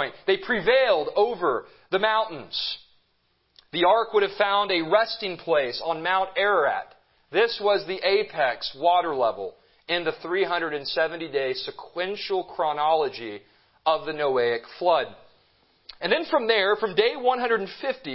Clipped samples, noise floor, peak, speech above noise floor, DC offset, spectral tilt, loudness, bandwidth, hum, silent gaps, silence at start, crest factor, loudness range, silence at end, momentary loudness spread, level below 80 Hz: under 0.1%; -69 dBFS; -6 dBFS; 45 dB; under 0.1%; -7.5 dB/octave; -24 LUFS; 5.8 kHz; none; none; 0 s; 18 dB; 3 LU; 0 s; 9 LU; -64 dBFS